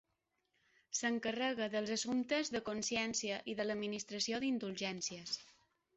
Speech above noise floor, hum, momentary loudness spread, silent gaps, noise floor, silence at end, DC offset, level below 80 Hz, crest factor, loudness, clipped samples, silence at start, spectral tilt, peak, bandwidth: 46 dB; none; 6 LU; none; -85 dBFS; 0.45 s; under 0.1%; -76 dBFS; 16 dB; -38 LUFS; under 0.1%; 0.9 s; -2.5 dB/octave; -24 dBFS; 8.2 kHz